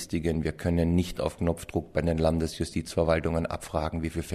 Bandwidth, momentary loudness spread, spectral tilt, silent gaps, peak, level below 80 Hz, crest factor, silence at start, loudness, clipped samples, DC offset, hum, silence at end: 15 kHz; 6 LU; -6.5 dB/octave; none; -10 dBFS; -40 dBFS; 18 dB; 0 s; -28 LUFS; under 0.1%; under 0.1%; none; 0 s